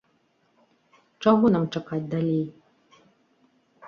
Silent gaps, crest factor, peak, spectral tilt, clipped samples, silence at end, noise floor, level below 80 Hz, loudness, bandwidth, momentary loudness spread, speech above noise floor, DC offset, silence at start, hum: none; 20 dB; -8 dBFS; -8.5 dB/octave; under 0.1%; 0 s; -67 dBFS; -66 dBFS; -24 LUFS; 6.8 kHz; 10 LU; 45 dB; under 0.1%; 1.2 s; none